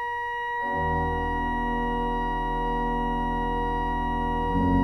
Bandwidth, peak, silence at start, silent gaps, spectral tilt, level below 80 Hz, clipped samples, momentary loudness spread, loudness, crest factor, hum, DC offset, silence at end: 10 kHz; -12 dBFS; 0 s; none; -7.5 dB/octave; -34 dBFS; under 0.1%; 2 LU; -27 LUFS; 14 dB; none; under 0.1%; 0 s